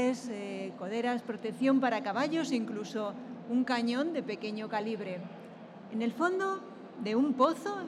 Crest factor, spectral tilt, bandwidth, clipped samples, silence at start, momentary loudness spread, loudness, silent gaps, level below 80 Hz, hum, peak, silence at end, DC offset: 18 dB; -5.5 dB/octave; 12 kHz; under 0.1%; 0 s; 12 LU; -33 LUFS; none; -88 dBFS; none; -14 dBFS; 0 s; under 0.1%